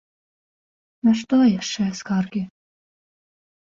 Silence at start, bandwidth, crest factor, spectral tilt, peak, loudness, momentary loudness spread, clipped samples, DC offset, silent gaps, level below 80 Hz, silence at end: 1.05 s; 7.8 kHz; 16 dB; -5.5 dB/octave; -8 dBFS; -21 LUFS; 11 LU; under 0.1%; under 0.1%; none; -62 dBFS; 1.3 s